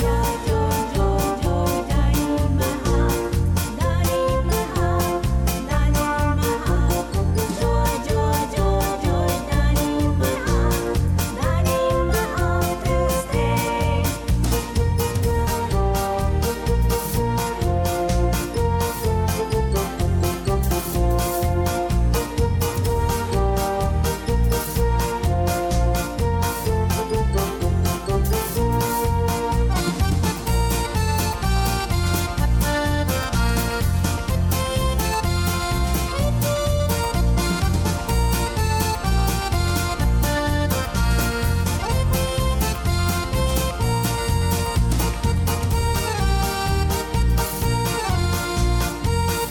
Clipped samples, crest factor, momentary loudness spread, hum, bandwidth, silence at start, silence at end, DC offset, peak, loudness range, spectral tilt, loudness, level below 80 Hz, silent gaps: under 0.1%; 14 dB; 2 LU; none; 19 kHz; 0 s; 0 s; under 0.1%; -6 dBFS; 1 LU; -5.5 dB/octave; -22 LUFS; -24 dBFS; none